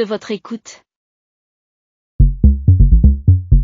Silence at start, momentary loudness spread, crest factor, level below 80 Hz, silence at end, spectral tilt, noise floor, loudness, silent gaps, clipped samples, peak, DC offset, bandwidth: 0 s; 14 LU; 12 dB; -16 dBFS; 0 s; -8.5 dB/octave; under -90 dBFS; -13 LUFS; 0.96-2.19 s; under 0.1%; 0 dBFS; under 0.1%; 7.6 kHz